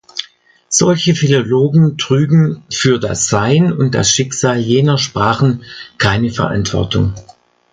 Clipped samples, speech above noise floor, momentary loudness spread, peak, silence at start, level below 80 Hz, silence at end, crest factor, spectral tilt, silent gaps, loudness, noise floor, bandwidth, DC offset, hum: under 0.1%; 32 dB; 5 LU; 0 dBFS; 0.15 s; -38 dBFS; 0.5 s; 14 dB; -5 dB/octave; none; -13 LUFS; -45 dBFS; 9.4 kHz; under 0.1%; none